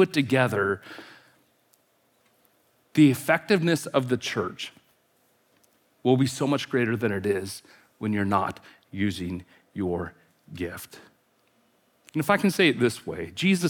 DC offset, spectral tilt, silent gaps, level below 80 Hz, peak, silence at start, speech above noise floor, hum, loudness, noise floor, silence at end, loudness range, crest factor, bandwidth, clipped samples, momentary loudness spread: under 0.1%; -5.5 dB/octave; none; -68 dBFS; -6 dBFS; 0 s; 42 dB; none; -25 LUFS; -67 dBFS; 0 s; 6 LU; 20 dB; 19 kHz; under 0.1%; 18 LU